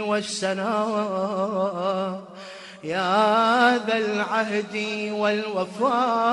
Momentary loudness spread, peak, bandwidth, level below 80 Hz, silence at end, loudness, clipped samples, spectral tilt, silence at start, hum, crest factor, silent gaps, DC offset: 11 LU; -6 dBFS; 11.5 kHz; -72 dBFS; 0 s; -23 LUFS; under 0.1%; -4.5 dB/octave; 0 s; none; 18 dB; none; under 0.1%